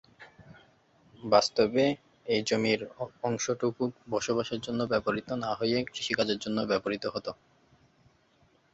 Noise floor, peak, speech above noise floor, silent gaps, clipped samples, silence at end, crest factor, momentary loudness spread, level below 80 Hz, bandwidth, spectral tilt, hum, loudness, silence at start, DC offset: -66 dBFS; -8 dBFS; 37 dB; none; under 0.1%; 1.4 s; 24 dB; 10 LU; -64 dBFS; 8.2 kHz; -4.5 dB/octave; none; -30 LUFS; 0.2 s; under 0.1%